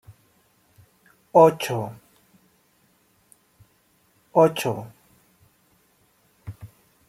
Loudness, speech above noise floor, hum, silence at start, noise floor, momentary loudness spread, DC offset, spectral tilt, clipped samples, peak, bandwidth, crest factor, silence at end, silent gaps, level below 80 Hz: -21 LUFS; 44 dB; none; 0.1 s; -63 dBFS; 27 LU; under 0.1%; -6 dB/octave; under 0.1%; -2 dBFS; 16 kHz; 24 dB; 0.4 s; none; -64 dBFS